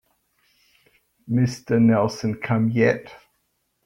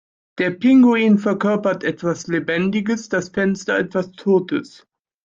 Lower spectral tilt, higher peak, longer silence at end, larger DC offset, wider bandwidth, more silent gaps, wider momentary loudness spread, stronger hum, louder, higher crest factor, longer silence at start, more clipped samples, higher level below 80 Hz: about the same, -7.5 dB/octave vs -6.5 dB/octave; about the same, -6 dBFS vs -4 dBFS; about the same, 0.7 s vs 0.6 s; neither; first, 11.5 kHz vs 7.6 kHz; neither; about the same, 8 LU vs 10 LU; neither; about the same, -21 LUFS vs -19 LUFS; about the same, 18 dB vs 14 dB; first, 1.3 s vs 0.35 s; neither; about the same, -60 dBFS vs -60 dBFS